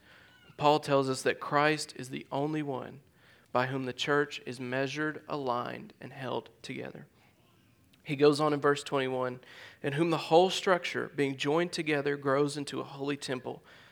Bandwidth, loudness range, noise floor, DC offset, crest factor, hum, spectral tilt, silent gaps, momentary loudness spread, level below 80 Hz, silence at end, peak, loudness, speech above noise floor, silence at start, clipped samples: 17.5 kHz; 6 LU; -64 dBFS; under 0.1%; 22 dB; none; -5 dB/octave; none; 16 LU; -76 dBFS; 0.35 s; -10 dBFS; -31 LUFS; 34 dB; 0.6 s; under 0.1%